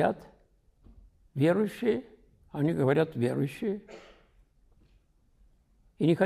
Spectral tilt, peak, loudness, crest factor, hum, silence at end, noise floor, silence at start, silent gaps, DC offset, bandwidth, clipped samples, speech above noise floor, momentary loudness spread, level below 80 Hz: -8 dB/octave; -12 dBFS; -29 LUFS; 18 dB; none; 0 s; -65 dBFS; 0 s; none; under 0.1%; 14.5 kHz; under 0.1%; 37 dB; 16 LU; -62 dBFS